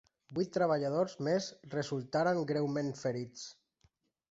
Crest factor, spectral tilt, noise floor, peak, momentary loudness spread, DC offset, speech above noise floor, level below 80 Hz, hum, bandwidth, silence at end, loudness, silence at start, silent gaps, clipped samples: 16 dB; -6 dB/octave; -74 dBFS; -18 dBFS; 10 LU; under 0.1%; 40 dB; -74 dBFS; none; 8 kHz; 0.8 s; -34 LUFS; 0.3 s; none; under 0.1%